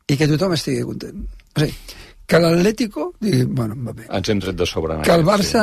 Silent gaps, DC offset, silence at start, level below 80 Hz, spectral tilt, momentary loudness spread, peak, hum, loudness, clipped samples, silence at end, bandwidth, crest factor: none; under 0.1%; 0.1 s; -40 dBFS; -5.5 dB/octave; 16 LU; -2 dBFS; none; -19 LUFS; under 0.1%; 0 s; 13.5 kHz; 16 dB